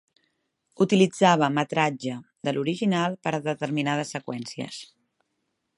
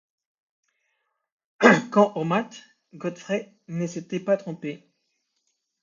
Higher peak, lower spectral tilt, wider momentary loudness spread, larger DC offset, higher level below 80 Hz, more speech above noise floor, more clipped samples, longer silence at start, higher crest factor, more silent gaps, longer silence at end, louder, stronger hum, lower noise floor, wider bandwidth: second, -4 dBFS vs 0 dBFS; about the same, -5.5 dB/octave vs -6 dB/octave; second, 15 LU vs 18 LU; neither; about the same, -70 dBFS vs -74 dBFS; about the same, 53 dB vs 51 dB; neither; second, 0.8 s vs 1.6 s; about the same, 22 dB vs 26 dB; neither; about the same, 0.95 s vs 1.05 s; about the same, -25 LUFS vs -23 LUFS; neither; about the same, -77 dBFS vs -76 dBFS; first, 11.5 kHz vs 7.6 kHz